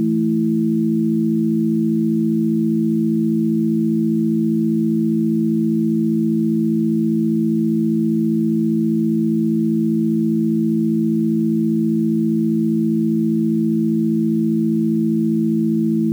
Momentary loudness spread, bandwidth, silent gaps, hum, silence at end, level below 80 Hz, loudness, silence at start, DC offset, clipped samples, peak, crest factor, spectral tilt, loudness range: 0 LU; 0.4 kHz; none; none; 0 s; -78 dBFS; -18 LUFS; 0 s; under 0.1%; under 0.1%; -10 dBFS; 6 dB; -10.5 dB/octave; 0 LU